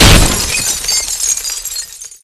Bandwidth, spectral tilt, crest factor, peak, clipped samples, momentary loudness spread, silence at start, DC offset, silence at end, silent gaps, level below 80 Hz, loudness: over 20 kHz; -2.5 dB/octave; 12 dB; 0 dBFS; 0.6%; 12 LU; 0 s; under 0.1%; 0.1 s; none; -18 dBFS; -12 LUFS